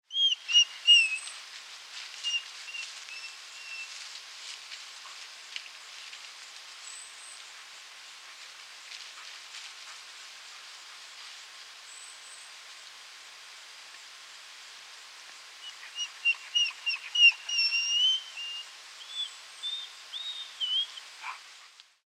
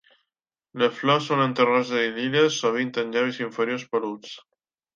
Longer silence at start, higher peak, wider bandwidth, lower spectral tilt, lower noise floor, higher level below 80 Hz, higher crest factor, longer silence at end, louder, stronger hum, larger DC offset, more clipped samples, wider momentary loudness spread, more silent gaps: second, 0.1 s vs 0.75 s; second, -10 dBFS vs -6 dBFS; first, 16 kHz vs 7.6 kHz; second, 6 dB/octave vs -4.5 dB/octave; second, -55 dBFS vs -86 dBFS; second, under -90 dBFS vs -76 dBFS; about the same, 22 dB vs 18 dB; second, 0.4 s vs 0.55 s; second, -27 LUFS vs -23 LUFS; neither; neither; neither; first, 23 LU vs 13 LU; neither